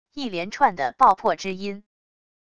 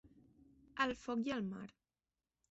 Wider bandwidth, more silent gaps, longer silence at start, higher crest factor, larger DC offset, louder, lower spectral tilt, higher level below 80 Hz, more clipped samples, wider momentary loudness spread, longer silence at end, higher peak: first, 11 kHz vs 8 kHz; neither; about the same, 0.15 s vs 0.05 s; about the same, 20 dB vs 22 dB; first, 0.5% vs under 0.1%; first, -22 LUFS vs -41 LUFS; about the same, -4.5 dB/octave vs -3.5 dB/octave; first, -60 dBFS vs -72 dBFS; neither; about the same, 15 LU vs 14 LU; about the same, 0.75 s vs 0.8 s; first, -4 dBFS vs -22 dBFS